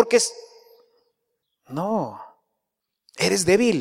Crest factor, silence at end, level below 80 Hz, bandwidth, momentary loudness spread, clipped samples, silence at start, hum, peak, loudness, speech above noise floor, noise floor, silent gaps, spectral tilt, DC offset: 22 dB; 0 s; -60 dBFS; 16 kHz; 19 LU; under 0.1%; 0 s; none; -2 dBFS; -22 LUFS; 61 dB; -82 dBFS; none; -3.5 dB/octave; under 0.1%